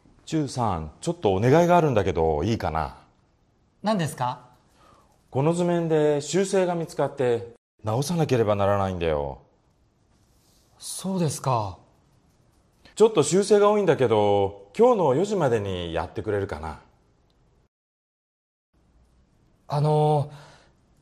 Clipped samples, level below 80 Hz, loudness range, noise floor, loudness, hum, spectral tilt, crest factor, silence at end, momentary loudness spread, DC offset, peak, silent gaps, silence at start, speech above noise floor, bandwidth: under 0.1%; -52 dBFS; 10 LU; -64 dBFS; -23 LUFS; none; -6 dB/octave; 18 dB; 0.6 s; 13 LU; under 0.1%; -8 dBFS; 7.58-7.78 s, 17.68-18.73 s; 0.25 s; 41 dB; 14 kHz